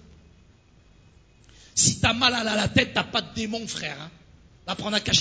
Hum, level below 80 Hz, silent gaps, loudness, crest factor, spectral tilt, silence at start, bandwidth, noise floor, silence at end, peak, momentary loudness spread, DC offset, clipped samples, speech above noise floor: none; -46 dBFS; none; -23 LUFS; 22 dB; -2.5 dB/octave; 1.75 s; 8 kHz; -56 dBFS; 0 s; -4 dBFS; 14 LU; under 0.1%; under 0.1%; 31 dB